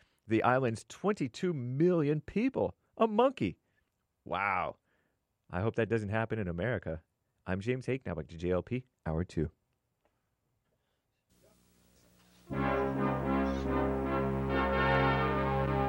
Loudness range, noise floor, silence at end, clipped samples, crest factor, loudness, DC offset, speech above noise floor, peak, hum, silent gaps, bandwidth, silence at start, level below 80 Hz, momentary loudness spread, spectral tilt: 9 LU; -80 dBFS; 0 s; under 0.1%; 20 dB; -33 LUFS; under 0.1%; 48 dB; -14 dBFS; none; none; 16 kHz; 0.25 s; -48 dBFS; 10 LU; -7.5 dB/octave